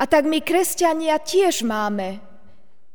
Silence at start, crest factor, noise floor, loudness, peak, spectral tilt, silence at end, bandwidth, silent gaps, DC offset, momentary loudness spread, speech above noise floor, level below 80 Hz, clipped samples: 0 s; 16 dB; -57 dBFS; -20 LUFS; -4 dBFS; -3 dB/octave; 0.75 s; over 20 kHz; none; 2%; 9 LU; 38 dB; -58 dBFS; under 0.1%